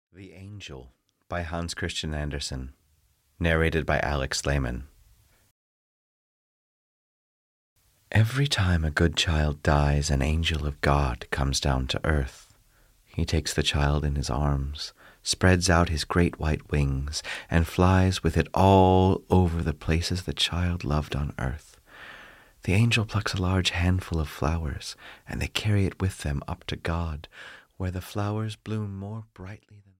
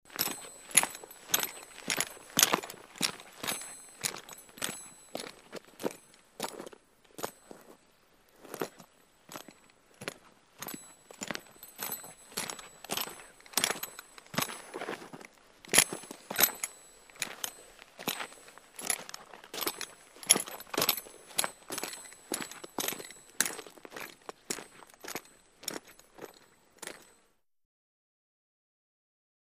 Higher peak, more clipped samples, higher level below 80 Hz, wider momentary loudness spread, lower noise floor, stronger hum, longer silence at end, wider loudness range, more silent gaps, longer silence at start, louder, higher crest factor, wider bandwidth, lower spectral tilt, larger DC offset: second, -6 dBFS vs -2 dBFS; neither; first, -36 dBFS vs -72 dBFS; second, 16 LU vs 23 LU; second, -66 dBFS vs -71 dBFS; neither; second, 0.2 s vs 2.55 s; second, 9 LU vs 15 LU; first, 5.51-7.76 s vs none; about the same, 0.15 s vs 0.05 s; first, -26 LUFS vs -33 LUFS; second, 20 dB vs 36 dB; about the same, 15.5 kHz vs 15.5 kHz; first, -5 dB/octave vs -0.5 dB/octave; neither